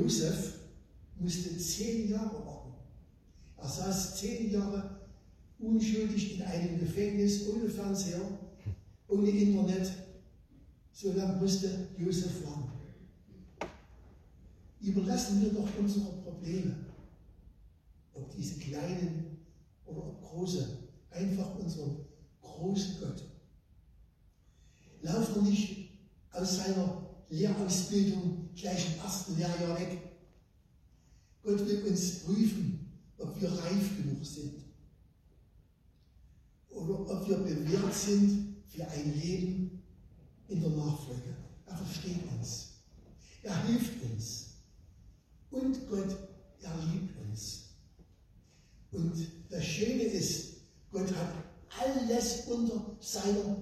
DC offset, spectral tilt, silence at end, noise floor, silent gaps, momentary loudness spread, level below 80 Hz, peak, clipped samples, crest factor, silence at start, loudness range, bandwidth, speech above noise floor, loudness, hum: under 0.1%; -5.5 dB/octave; 0 s; -64 dBFS; none; 16 LU; -56 dBFS; -16 dBFS; under 0.1%; 18 dB; 0 s; 7 LU; 14.5 kHz; 31 dB; -35 LUFS; none